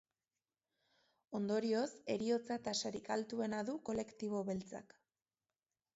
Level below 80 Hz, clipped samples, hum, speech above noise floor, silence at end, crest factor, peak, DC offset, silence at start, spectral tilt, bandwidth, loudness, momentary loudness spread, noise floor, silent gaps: -78 dBFS; under 0.1%; none; over 50 dB; 1.15 s; 16 dB; -26 dBFS; under 0.1%; 1.3 s; -4.5 dB/octave; 7.6 kHz; -40 LUFS; 6 LU; under -90 dBFS; none